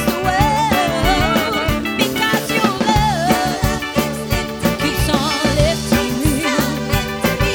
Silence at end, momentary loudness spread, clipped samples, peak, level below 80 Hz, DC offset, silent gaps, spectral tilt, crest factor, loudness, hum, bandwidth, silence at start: 0 s; 4 LU; under 0.1%; -2 dBFS; -28 dBFS; under 0.1%; none; -4.5 dB/octave; 16 dB; -17 LUFS; none; over 20 kHz; 0 s